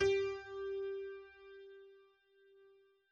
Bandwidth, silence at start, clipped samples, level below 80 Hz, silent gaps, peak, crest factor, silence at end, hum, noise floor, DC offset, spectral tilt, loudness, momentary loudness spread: 8.2 kHz; 0 s; under 0.1%; -68 dBFS; none; -22 dBFS; 18 dB; 1.15 s; none; -69 dBFS; under 0.1%; -4.5 dB/octave; -41 LUFS; 21 LU